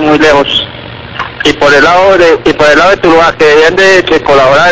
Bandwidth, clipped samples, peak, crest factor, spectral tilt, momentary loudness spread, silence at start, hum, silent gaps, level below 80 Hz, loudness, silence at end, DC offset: 8 kHz; 7%; 0 dBFS; 6 dB; -4 dB/octave; 13 LU; 0 s; none; none; -34 dBFS; -5 LUFS; 0 s; 2%